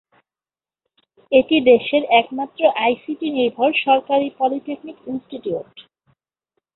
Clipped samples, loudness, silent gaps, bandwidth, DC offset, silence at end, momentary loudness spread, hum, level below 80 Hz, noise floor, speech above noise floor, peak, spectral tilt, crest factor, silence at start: under 0.1%; -18 LUFS; none; 4.2 kHz; under 0.1%; 0.95 s; 15 LU; none; -62 dBFS; under -90 dBFS; over 72 dB; -2 dBFS; -9 dB/octave; 18 dB; 1.3 s